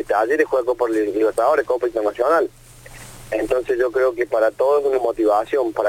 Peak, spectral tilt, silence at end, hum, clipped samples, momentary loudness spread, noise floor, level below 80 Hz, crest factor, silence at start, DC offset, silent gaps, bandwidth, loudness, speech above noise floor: -4 dBFS; -5 dB/octave; 0 s; none; under 0.1%; 7 LU; -40 dBFS; -50 dBFS; 16 dB; 0 s; under 0.1%; none; 17 kHz; -19 LUFS; 22 dB